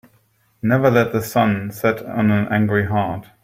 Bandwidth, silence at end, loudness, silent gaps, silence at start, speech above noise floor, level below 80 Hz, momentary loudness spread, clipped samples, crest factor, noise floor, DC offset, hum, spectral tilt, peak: 16 kHz; 0.2 s; -19 LUFS; none; 0.65 s; 42 dB; -54 dBFS; 6 LU; under 0.1%; 16 dB; -60 dBFS; under 0.1%; none; -7 dB/octave; -2 dBFS